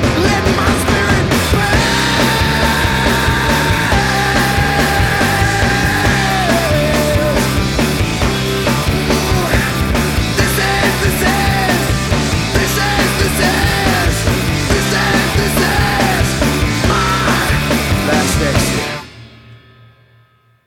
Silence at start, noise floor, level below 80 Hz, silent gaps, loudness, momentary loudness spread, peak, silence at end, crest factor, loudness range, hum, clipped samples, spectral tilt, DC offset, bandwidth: 0 s; -51 dBFS; -24 dBFS; none; -13 LUFS; 2 LU; 0 dBFS; 1.1 s; 14 dB; 2 LU; none; under 0.1%; -4.5 dB/octave; under 0.1%; 18.5 kHz